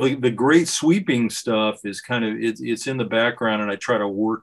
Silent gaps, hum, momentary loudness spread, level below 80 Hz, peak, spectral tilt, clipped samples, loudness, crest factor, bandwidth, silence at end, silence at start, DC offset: none; none; 8 LU; -66 dBFS; -4 dBFS; -4.5 dB/octave; under 0.1%; -21 LUFS; 18 dB; 12.5 kHz; 0.05 s; 0 s; under 0.1%